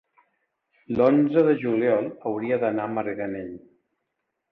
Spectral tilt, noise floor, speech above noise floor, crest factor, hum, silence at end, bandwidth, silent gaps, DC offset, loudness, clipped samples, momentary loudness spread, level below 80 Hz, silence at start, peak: -10 dB/octave; -79 dBFS; 57 dB; 18 dB; none; 0.95 s; 5.2 kHz; none; under 0.1%; -23 LUFS; under 0.1%; 13 LU; -64 dBFS; 0.9 s; -8 dBFS